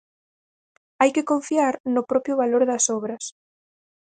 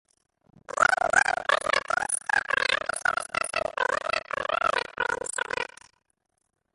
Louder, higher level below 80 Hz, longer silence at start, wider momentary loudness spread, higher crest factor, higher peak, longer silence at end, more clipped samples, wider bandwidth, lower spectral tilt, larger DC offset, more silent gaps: first, -22 LUFS vs -26 LUFS; second, -72 dBFS vs -60 dBFS; first, 1 s vs 0.7 s; about the same, 10 LU vs 8 LU; about the same, 20 dB vs 22 dB; about the same, -4 dBFS vs -6 dBFS; second, 0.85 s vs 1.1 s; neither; second, 9.6 kHz vs 12 kHz; first, -3 dB/octave vs -0.5 dB/octave; neither; first, 1.80-1.84 s vs none